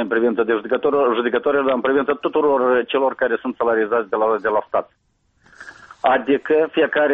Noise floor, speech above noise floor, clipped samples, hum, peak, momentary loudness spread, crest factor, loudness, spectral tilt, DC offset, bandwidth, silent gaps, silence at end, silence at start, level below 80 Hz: -59 dBFS; 40 dB; under 0.1%; none; -2 dBFS; 4 LU; 16 dB; -19 LUFS; -6.5 dB/octave; under 0.1%; 5 kHz; none; 0 s; 0 s; -60 dBFS